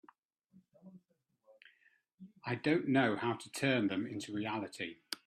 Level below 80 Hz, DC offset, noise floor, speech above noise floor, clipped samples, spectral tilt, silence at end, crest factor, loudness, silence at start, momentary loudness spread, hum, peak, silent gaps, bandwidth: -80 dBFS; under 0.1%; -77 dBFS; 43 dB; under 0.1%; -5.5 dB/octave; 0.1 s; 20 dB; -35 LUFS; 0.85 s; 11 LU; none; -18 dBFS; 2.14-2.18 s; 13 kHz